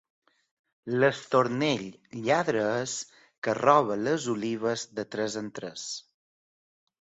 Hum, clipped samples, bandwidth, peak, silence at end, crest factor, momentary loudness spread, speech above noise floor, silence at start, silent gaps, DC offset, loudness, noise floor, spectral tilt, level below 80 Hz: none; under 0.1%; 8.4 kHz; -6 dBFS; 1 s; 22 dB; 14 LU; over 63 dB; 0.85 s; 3.38-3.42 s; under 0.1%; -28 LUFS; under -90 dBFS; -4.5 dB/octave; -70 dBFS